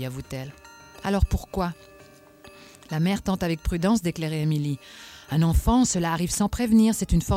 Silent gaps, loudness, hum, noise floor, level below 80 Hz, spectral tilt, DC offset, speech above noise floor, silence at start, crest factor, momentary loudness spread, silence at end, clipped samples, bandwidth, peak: none; -24 LUFS; none; -51 dBFS; -34 dBFS; -5.5 dB/octave; under 0.1%; 27 dB; 0 s; 18 dB; 14 LU; 0 s; under 0.1%; 16.5 kHz; -8 dBFS